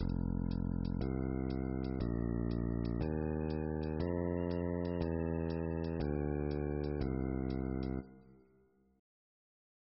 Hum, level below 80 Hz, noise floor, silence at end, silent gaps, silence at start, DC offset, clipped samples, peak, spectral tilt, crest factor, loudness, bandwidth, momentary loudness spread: none; -46 dBFS; -70 dBFS; 1.75 s; none; 0 s; under 0.1%; under 0.1%; -22 dBFS; -9 dB/octave; 16 dB; -38 LUFS; 5.8 kHz; 2 LU